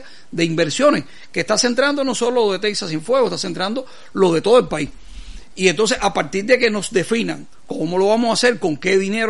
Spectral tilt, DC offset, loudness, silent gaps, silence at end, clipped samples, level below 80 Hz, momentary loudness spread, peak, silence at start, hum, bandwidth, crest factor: -4 dB/octave; 2%; -18 LUFS; none; 0 s; under 0.1%; -46 dBFS; 11 LU; 0 dBFS; 0.05 s; none; 11.5 kHz; 18 dB